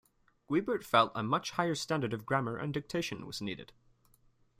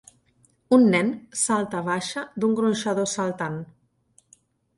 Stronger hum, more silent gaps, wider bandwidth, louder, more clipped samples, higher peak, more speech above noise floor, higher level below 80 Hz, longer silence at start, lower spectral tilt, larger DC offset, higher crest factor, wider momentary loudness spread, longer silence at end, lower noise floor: neither; neither; first, 16 kHz vs 11.5 kHz; second, -33 LUFS vs -23 LUFS; neither; second, -12 dBFS vs -6 dBFS; second, 34 dB vs 41 dB; about the same, -66 dBFS vs -66 dBFS; second, 0.5 s vs 0.7 s; about the same, -5 dB/octave vs -4.5 dB/octave; neither; about the same, 22 dB vs 20 dB; about the same, 11 LU vs 13 LU; second, 0.9 s vs 1.15 s; first, -67 dBFS vs -63 dBFS